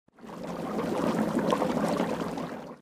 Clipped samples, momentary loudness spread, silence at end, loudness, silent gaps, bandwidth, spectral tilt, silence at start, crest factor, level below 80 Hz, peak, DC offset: under 0.1%; 11 LU; 0.05 s; -30 LUFS; none; 15.5 kHz; -6 dB/octave; 0.2 s; 20 dB; -60 dBFS; -10 dBFS; under 0.1%